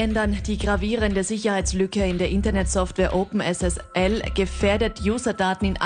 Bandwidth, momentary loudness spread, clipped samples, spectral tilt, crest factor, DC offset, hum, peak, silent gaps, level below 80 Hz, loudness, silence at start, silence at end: 10 kHz; 2 LU; under 0.1%; -5 dB/octave; 14 dB; under 0.1%; none; -8 dBFS; none; -30 dBFS; -23 LUFS; 0 s; 0 s